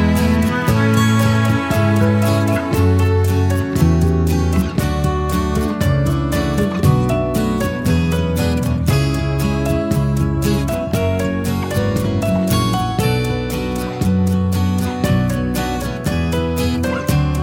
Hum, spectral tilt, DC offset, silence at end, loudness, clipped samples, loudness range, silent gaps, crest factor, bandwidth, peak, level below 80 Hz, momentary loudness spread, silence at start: none; -6.5 dB/octave; under 0.1%; 0 s; -17 LUFS; under 0.1%; 3 LU; none; 14 dB; 18 kHz; -2 dBFS; -28 dBFS; 5 LU; 0 s